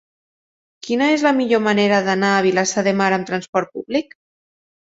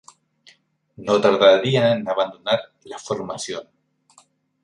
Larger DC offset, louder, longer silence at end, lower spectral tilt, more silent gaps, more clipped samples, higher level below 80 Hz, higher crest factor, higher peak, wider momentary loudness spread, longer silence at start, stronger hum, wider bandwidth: neither; about the same, -18 LUFS vs -19 LUFS; about the same, 0.95 s vs 1 s; about the same, -4.5 dB/octave vs -5 dB/octave; first, 3.49-3.53 s vs none; neither; about the same, -64 dBFS vs -64 dBFS; about the same, 18 dB vs 20 dB; about the same, -2 dBFS vs -2 dBFS; second, 8 LU vs 19 LU; second, 0.85 s vs 1 s; neither; second, 8 kHz vs 11 kHz